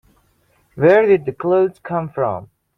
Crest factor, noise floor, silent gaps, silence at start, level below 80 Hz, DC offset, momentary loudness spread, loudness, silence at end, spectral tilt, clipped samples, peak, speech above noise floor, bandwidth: 16 dB; -60 dBFS; none; 0.75 s; -56 dBFS; under 0.1%; 11 LU; -17 LUFS; 0.3 s; -9 dB/octave; under 0.1%; -2 dBFS; 44 dB; 5.2 kHz